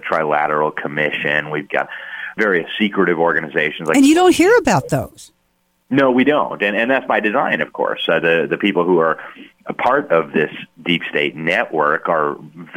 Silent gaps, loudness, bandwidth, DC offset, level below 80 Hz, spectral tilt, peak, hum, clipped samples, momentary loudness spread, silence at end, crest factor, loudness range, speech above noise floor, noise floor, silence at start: none; -16 LUFS; 16.5 kHz; under 0.1%; -54 dBFS; -5 dB/octave; -2 dBFS; none; under 0.1%; 10 LU; 0 s; 14 dB; 3 LU; 47 dB; -64 dBFS; 0.05 s